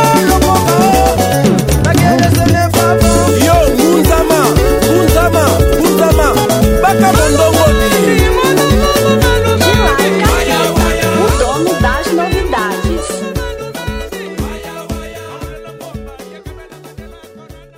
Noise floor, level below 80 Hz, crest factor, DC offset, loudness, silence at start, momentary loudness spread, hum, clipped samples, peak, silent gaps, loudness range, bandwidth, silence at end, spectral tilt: -35 dBFS; -20 dBFS; 10 dB; under 0.1%; -10 LUFS; 0 s; 15 LU; none; under 0.1%; 0 dBFS; none; 13 LU; 16.5 kHz; 0.2 s; -5 dB/octave